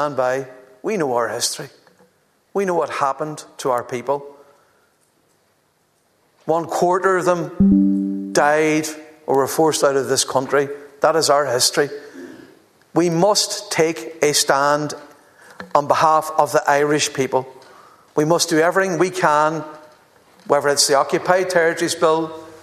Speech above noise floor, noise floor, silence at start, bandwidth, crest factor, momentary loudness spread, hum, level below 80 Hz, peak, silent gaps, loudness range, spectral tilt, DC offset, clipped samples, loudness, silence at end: 45 dB; -62 dBFS; 0 s; 14 kHz; 20 dB; 13 LU; none; -52 dBFS; 0 dBFS; none; 7 LU; -3.5 dB/octave; under 0.1%; under 0.1%; -18 LUFS; 0.05 s